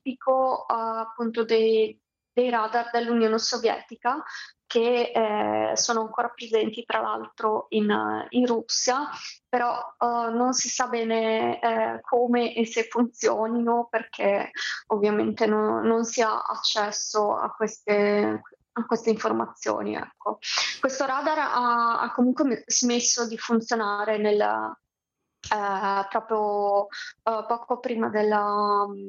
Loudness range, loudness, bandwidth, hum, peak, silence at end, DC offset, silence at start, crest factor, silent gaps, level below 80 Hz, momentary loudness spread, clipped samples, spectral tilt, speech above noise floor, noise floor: 3 LU; -25 LUFS; 7.6 kHz; none; -6 dBFS; 0 s; under 0.1%; 0.05 s; 18 dB; none; -74 dBFS; 7 LU; under 0.1%; -3 dB/octave; 58 dB; -83 dBFS